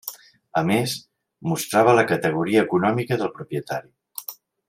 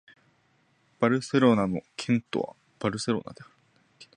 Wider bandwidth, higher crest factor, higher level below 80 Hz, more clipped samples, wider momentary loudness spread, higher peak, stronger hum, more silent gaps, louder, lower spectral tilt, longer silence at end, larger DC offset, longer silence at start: first, 16 kHz vs 10.5 kHz; about the same, 20 dB vs 22 dB; about the same, -64 dBFS vs -62 dBFS; neither; first, 17 LU vs 11 LU; first, -2 dBFS vs -8 dBFS; neither; neither; first, -22 LUFS vs -27 LUFS; about the same, -5.5 dB/octave vs -6 dB/octave; first, 0.35 s vs 0.1 s; neither; second, 0.05 s vs 1 s